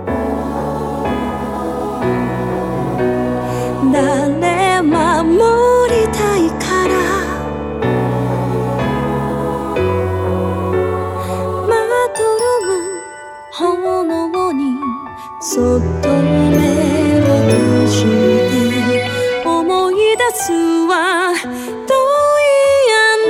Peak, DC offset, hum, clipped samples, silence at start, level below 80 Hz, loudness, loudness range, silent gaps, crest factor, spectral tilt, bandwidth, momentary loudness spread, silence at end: -2 dBFS; under 0.1%; none; under 0.1%; 0 s; -36 dBFS; -15 LUFS; 5 LU; none; 12 dB; -5.5 dB/octave; 17.5 kHz; 9 LU; 0 s